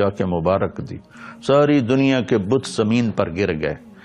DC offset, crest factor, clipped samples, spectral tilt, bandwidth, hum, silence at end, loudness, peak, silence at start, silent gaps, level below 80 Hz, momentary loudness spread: under 0.1%; 16 dB; under 0.1%; -6.5 dB/octave; 11 kHz; none; 0.1 s; -19 LUFS; -2 dBFS; 0 s; none; -48 dBFS; 15 LU